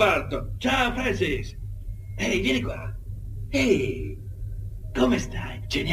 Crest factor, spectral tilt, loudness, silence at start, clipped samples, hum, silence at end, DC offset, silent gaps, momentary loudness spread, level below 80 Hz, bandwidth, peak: 20 dB; -5 dB/octave; -26 LUFS; 0 s; under 0.1%; none; 0 s; under 0.1%; none; 15 LU; -36 dBFS; 15.5 kHz; -6 dBFS